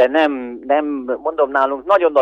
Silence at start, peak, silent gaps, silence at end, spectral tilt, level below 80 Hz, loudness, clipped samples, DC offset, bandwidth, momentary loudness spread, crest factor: 0 s; -2 dBFS; none; 0 s; -5 dB/octave; -58 dBFS; -18 LUFS; under 0.1%; under 0.1%; 6.6 kHz; 8 LU; 14 dB